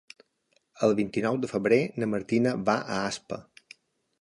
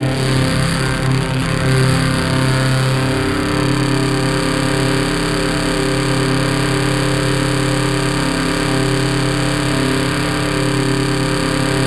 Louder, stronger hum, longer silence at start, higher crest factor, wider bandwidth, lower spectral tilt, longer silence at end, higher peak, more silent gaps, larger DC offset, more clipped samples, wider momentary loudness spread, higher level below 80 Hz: second, -27 LUFS vs -16 LUFS; neither; first, 0.75 s vs 0 s; first, 20 dB vs 12 dB; second, 11.5 kHz vs 13.5 kHz; about the same, -6 dB/octave vs -5 dB/octave; first, 0.8 s vs 0 s; second, -8 dBFS vs -4 dBFS; neither; neither; neither; first, 9 LU vs 2 LU; second, -66 dBFS vs -30 dBFS